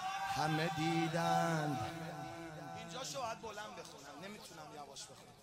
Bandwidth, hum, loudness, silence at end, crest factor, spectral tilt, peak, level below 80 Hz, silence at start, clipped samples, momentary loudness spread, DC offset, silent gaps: 16 kHz; none; -39 LUFS; 0 s; 18 dB; -4.5 dB/octave; -22 dBFS; -72 dBFS; 0 s; under 0.1%; 16 LU; under 0.1%; none